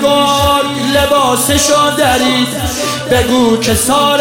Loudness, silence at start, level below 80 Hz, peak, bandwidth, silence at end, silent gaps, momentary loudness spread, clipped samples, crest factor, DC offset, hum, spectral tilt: -11 LUFS; 0 s; -30 dBFS; 0 dBFS; 17 kHz; 0 s; none; 4 LU; under 0.1%; 10 dB; 0.3%; none; -3.5 dB/octave